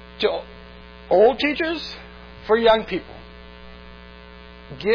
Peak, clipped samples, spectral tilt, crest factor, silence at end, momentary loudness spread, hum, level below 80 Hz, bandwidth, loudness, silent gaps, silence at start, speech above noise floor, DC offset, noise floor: -4 dBFS; under 0.1%; -6 dB/octave; 18 dB; 0 s; 26 LU; none; -46 dBFS; 5.4 kHz; -20 LUFS; none; 0 s; 23 dB; under 0.1%; -42 dBFS